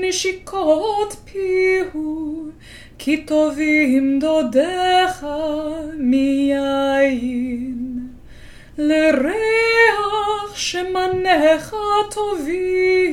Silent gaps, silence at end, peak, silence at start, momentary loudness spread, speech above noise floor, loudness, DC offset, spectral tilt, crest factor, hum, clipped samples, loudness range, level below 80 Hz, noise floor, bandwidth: none; 0 s; -2 dBFS; 0 s; 11 LU; 21 dB; -18 LUFS; under 0.1%; -3.5 dB/octave; 16 dB; none; under 0.1%; 3 LU; -46 dBFS; -39 dBFS; 16.5 kHz